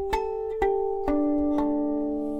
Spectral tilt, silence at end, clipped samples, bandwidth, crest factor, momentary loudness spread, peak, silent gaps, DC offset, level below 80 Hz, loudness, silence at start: -7 dB/octave; 0 s; under 0.1%; 9.4 kHz; 16 dB; 4 LU; -10 dBFS; none; under 0.1%; -44 dBFS; -26 LUFS; 0 s